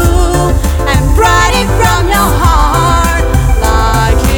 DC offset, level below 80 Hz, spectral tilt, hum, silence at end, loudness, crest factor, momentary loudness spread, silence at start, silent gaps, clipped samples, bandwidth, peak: 0.5%; -12 dBFS; -5 dB/octave; none; 0 s; -10 LUFS; 8 dB; 3 LU; 0 s; none; under 0.1%; over 20 kHz; 0 dBFS